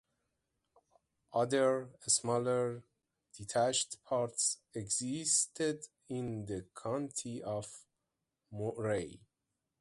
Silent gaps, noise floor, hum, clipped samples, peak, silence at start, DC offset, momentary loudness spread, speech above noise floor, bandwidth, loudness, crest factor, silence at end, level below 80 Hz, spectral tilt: none; -87 dBFS; none; under 0.1%; -14 dBFS; 1.3 s; under 0.1%; 13 LU; 52 dB; 11.5 kHz; -35 LUFS; 22 dB; 0.65 s; -70 dBFS; -3.5 dB/octave